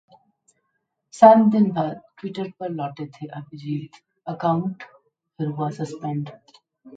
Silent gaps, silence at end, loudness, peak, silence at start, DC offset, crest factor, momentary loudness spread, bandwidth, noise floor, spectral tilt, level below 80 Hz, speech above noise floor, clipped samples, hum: none; 0.1 s; -21 LUFS; 0 dBFS; 1.15 s; under 0.1%; 22 dB; 21 LU; 9 kHz; -75 dBFS; -8 dB/octave; -70 dBFS; 54 dB; under 0.1%; none